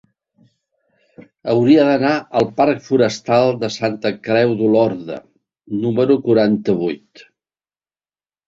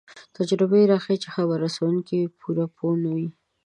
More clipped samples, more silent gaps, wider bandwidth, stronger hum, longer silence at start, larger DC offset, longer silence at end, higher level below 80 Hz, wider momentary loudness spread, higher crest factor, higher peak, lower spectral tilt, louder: neither; neither; second, 7.8 kHz vs 10.5 kHz; neither; first, 1.2 s vs 0.1 s; neither; first, 1.5 s vs 0.35 s; first, -58 dBFS vs -72 dBFS; first, 13 LU vs 9 LU; about the same, 16 dB vs 16 dB; first, -2 dBFS vs -6 dBFS; about the same, -6.5 dB/octave vs -7 dB/octave; first, -16 LUFS vs -23 LUFS